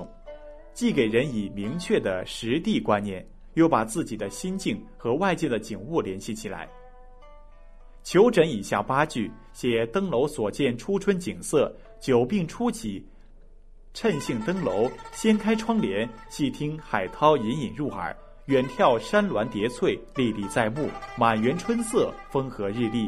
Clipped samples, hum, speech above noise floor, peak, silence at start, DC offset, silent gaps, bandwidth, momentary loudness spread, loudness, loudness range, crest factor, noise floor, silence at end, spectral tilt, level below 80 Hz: under 0.1%; none; 23 dB; -4 dBFS; 0 s; under 0.1%; none; 14.5 kHz; 12 LU; -26 LUFS; 3 LU; 20 dB; -48 dBFS; 0 s; -5.5 dB/octave; -48 dBFS